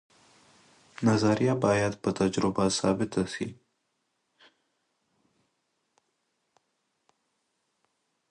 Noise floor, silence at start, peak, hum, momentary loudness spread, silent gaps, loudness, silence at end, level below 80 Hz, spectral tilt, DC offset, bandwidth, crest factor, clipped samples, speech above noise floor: -78 dBFS; 1 s; -10 dBFS; none; 7 LU; none; -27 LUFS; 4.8 s; -60 dBFS; -5.5 dB/octave; under 0.1%; 11 kHz; 20 dB; under 0.1%; 52 dB